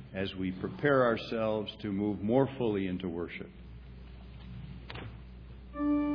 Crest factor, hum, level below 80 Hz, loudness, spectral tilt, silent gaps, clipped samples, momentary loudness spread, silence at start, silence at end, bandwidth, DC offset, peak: 20 dB; none; -52 dBFS; -32 LUFS; -5.5 dB/octave; none; under 0.1%; 22 LU; 0 s; 0 s; 5.4 kHz; under 0.1%; -12 dBFS